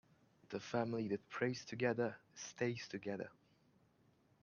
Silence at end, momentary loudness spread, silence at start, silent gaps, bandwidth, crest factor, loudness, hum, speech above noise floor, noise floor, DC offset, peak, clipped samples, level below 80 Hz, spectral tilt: 1.1 s; 11 LU; 0.5 s; none; 7.2 kHz; 22 dB; -42 LUFS; none; 32 dB; -74 dBFS; under 0.1%; -22 dBFS; under 0.1%; -82 dBFS; -5.5 dB/octave